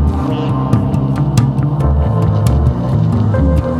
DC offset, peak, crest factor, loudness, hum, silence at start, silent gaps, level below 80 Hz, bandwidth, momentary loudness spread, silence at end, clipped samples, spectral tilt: under 0.1%; 0 dBFS; 12 dB; -14 LUFS; none; 0 s; none; -20 dBFS; 12.5 kHz; 3 LU; 0 s; under 0.1%; -8.5 dB/octave